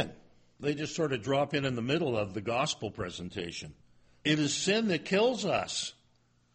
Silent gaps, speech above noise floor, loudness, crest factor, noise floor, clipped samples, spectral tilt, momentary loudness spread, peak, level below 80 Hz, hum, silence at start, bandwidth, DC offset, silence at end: none; 37 dB; -31 LUFS; 18 dB; -68 dBFS; under 0.1%; -4 dB/octave; 11 LU; -14 dBFS; -62 dBFS; none; 0 s; 8.8 kHz; under 0.1%; 0.6 s